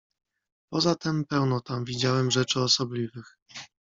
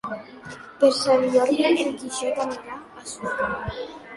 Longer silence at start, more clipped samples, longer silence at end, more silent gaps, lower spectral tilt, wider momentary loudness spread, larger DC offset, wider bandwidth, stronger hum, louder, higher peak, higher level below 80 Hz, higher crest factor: first, 0.7 s vs 0.05 s; neither; first, 0.2 s vs 0 s; first, 3.42-3.46 s vs none; about the same, -4.5 dB/octave vs -4 dB/octave; about the same, 20 LU vs 18 LU; neither; second, 7.8 kHz vs 11.5 kHz; neither; second, -26 LUFS vs -22 LUFS; about the same, -8 dBFS vs -6 dBFS; second, -62 dBFS vs -52 dBFS; about the same, 18 dB vs 18 dB